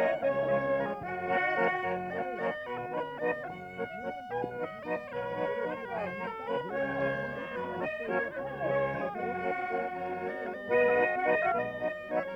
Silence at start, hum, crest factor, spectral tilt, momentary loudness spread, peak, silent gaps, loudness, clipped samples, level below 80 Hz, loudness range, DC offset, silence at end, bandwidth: 0 s; none; 16 dB; -7 dB/octave; 9 LU; -16 dBFS; none; -32 LUFS; under 0.1%; -64 dBFS; 5 LU; under 0.1%; 0 s; 7.8 kHz